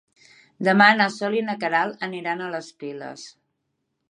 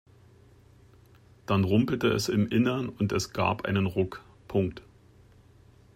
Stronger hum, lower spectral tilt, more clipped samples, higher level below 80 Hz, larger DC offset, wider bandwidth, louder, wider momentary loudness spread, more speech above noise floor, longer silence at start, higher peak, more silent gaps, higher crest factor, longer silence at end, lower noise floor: neither; about the same, -5 dB/octave vs -6 dB/octave; neither; second, -78 dBFS vs -58 dBFS; neither; second, 11 kHz vs 16 kHz; first, -21 LUFS vs -28 LUFS; first, 20 LU vs 9 LU; first, 54 dB vs 30 dB; second, 0.6 s vs 1.5 s; first, -2 dBFS vs -12 dBFS; neither; about the same, 22 dB vs 18 dB; second, 0.8 s vs 1.15 s; first, -76 dBFS vs -56 dBFS